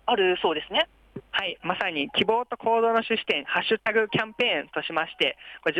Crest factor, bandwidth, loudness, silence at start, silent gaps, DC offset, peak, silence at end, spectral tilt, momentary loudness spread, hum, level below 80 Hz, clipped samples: 16 dB; 9.4 kHz; -25 LUFS; 0.05 s; none; under 0.1%; -10 dBFS; 0 s; -5.5 dB/octave; 6 LU; none; -62 dBFS; under 0.1%